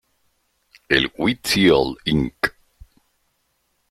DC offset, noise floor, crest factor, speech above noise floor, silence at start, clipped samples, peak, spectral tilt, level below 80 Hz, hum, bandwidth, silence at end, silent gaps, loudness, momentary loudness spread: under 0.1%; -69 dBFS; 20 dB; 50 dB; 0.9 s; under 0.1%; -2 dBFS; -4.5 dB/octave; -44 dBFS; none; 16 kHz; 1.4 s; none; -19 LUFS; 8 LU